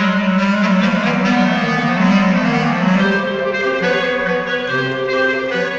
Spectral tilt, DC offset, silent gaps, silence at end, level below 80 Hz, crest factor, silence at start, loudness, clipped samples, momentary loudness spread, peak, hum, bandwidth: -6.5 dB/octave; under 0.1%; none; 0 s; -48 dBFS; 12 dB; 0 s; -15 LUFS; under 0.1%; 4 LU; -2 dBFS; none; 7.6 kHz